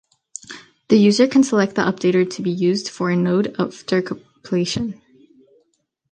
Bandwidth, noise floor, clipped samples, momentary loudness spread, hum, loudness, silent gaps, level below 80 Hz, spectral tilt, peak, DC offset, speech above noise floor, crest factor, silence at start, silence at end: 9.8 kHz; -68 dBFS; under 0.1%; 20 LU; none; -19 LUFS; none; -58 dBFS; -5.5 dB/octave; -2 dBFS; under 0.1%; 51 dB; 18 dB; 0.5 s; 1.2 s